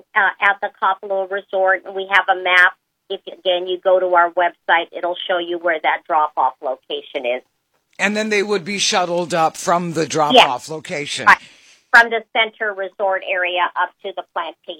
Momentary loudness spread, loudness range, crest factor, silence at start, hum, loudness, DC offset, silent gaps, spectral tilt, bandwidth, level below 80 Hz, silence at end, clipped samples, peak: 13 LU; 5 LU; 18 dB; 0.15 s; none; -17 LUFS; under 0.1%; none; -2.5 dB/octave; 16.5 kHz; -66 dBFS; 0.05 s; under 0.1%; 0 dBFS